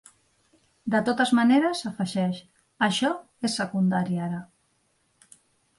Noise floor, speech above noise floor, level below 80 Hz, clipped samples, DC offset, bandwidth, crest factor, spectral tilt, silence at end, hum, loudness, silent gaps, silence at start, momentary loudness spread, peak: -69 dBFS; 45 dB; -70 dBFS; under 0.1%; under 0.1%; 11.5 kHz; 18 dB; -5 dB/octave; 1.35 s; none; -25 LUFS; none; 0.85 s; 11 LU; -8 dBFS